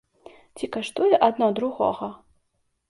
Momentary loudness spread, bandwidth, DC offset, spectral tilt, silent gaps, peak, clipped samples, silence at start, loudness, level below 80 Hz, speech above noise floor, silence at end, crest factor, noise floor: 15 LU; 11.5 kHz; under 0.1%; -5.5 dB/octave; none; -4 dBFS; under 0.1%; 0.55 s; -23 LUFS; -64 dBFS; 50 dB; 0.75 s; 22 dB; -72 dBFS